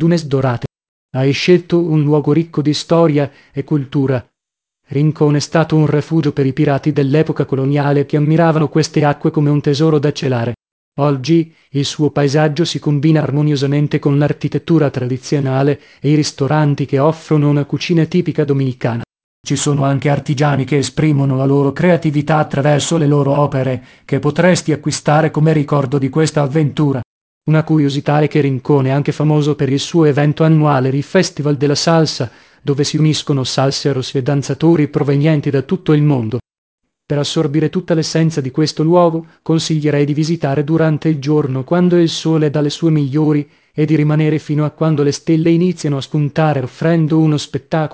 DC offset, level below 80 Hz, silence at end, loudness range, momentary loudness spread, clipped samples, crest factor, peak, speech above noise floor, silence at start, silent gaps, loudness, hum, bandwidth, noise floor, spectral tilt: under 0.1%; -50 dBFS; 0 s; 2 LU; 6 LU; under 0.1%; 14 dB; 0 dBFS; 68 dB; 0 s; 0.88-1.09 s, 10.72-10.92 s, 19.24-19.44 s, 27.05-27.41 s, 36.58-36.78 s; -15 LUFS; none; 8 kHz; -82 dBFS; -6.5 dB/octave